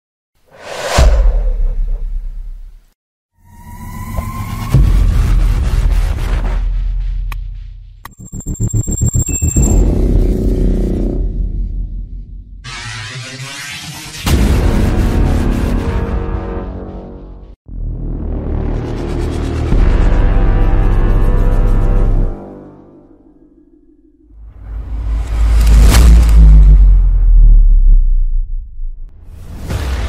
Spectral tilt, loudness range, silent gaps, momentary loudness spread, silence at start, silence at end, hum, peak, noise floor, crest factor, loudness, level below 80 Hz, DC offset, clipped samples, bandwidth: -6 dB/octave; 12 LU; 2.95-3.29 s, 17.56-17.65 s; 20 LU; 0.6 s; 0 s; none; 0 dBFS; -46 dBFS; 12 dB; -15 LUFS; -12 dBFS; under 0.1%; under 0.1%; 15.5 kHz